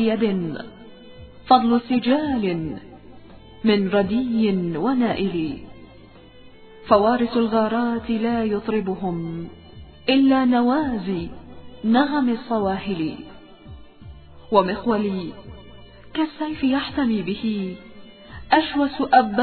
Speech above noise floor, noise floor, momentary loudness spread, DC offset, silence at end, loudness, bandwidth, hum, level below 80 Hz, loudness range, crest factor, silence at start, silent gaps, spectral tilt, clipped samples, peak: 25 dB; -46 dBFS; 18 LU; under 0.1%; 0 s; -21 LUFS; 4.5 kHz; none; -50 dBFS; 4 LU; 20 dB; 0 s; none; -10 dB/octave; under 0.1%; -2 dBFS